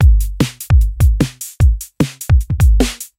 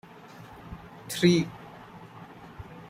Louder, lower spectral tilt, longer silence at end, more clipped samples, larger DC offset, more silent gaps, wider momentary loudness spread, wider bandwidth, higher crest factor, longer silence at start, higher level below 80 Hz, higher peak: first, -15 LUFS vs -26 LUFS; about the same, -6 dB/octave vs -5.5 dB/octave; first, 0.15 s vs 0 s; neither; neither; neither; second, 7 LU vs 24 LU; about the same, 16.5 kHz vs 16 kHz; second, 12 dB vs 22 dB; second, 0 s vs 0.25 s; first, -14 dBFS vs -56 dBFS; first, 0 dBFS vs -10 dBFS